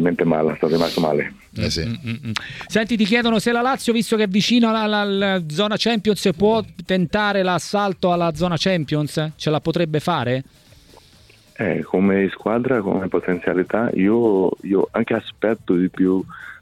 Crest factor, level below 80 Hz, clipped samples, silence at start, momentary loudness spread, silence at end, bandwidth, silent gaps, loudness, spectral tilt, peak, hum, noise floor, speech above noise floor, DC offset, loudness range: 18 dB; -48 dBFS; under 0.1%; 0 s; 7 LU; 0.05 s; 15 kHz; none; -20 LUFS; -5.5 dB/octave; -2 dBFS; none; -50 dBFS; 31 dB; under 0.1%; 4 LU